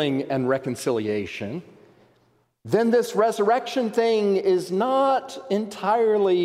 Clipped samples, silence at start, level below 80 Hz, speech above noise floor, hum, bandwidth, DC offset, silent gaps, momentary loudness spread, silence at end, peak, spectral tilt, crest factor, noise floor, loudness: under 0.1%; 0 s; -68 dBFS; 42 dB; none; 15 kHz; under 0.1%; none; 7 LU; 0 s; -6 dBFS; -5.5 dB/octave; 16 dB; -64 dBFS; -23 LUFS